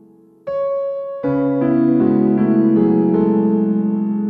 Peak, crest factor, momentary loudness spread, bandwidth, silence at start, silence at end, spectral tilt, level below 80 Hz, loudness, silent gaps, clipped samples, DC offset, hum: -4 dBFS; 12 dB; 9 LU; 4.2 kHz; 0.45 s; 0 s; -12.5 dB/octave; -52 dBFS; -16 LUFS; none; under 0.1%; under 0.1%; none